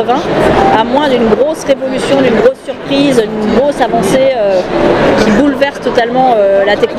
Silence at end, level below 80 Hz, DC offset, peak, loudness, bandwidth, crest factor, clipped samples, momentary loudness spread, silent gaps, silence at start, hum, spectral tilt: 0 s; -32 dBFS; under 0.1%; 0 dBFS; -10 LUFS; 15 kHz; 10 dB; 0.4%; 4 LU; none; 0 s; none; -5.5 dB/octave